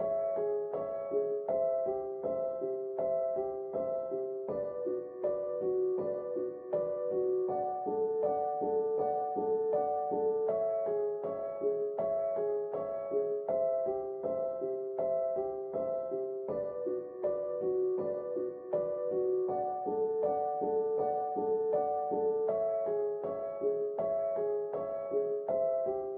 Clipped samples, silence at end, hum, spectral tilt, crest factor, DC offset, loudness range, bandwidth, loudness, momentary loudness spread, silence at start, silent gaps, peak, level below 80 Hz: under 0.1%; 0 s; none; -9 dB/octave; 14 dB; under 0.1%; 3 LU; 2.5 kHz; -34 LUFS; 5 LU; 0 s; none; -20 dBFS; -72 dBFS